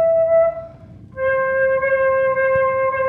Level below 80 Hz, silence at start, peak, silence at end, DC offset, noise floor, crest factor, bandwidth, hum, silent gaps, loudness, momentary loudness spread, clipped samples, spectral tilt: -50 dBFS; 0 s; -8 dBFS; 0 s; under 0.1%; -40 dBFS; 10 dB; 3.6 kHz; none; none; -17 LUFS; 8 LU; under 0.1%; -8 dB/octave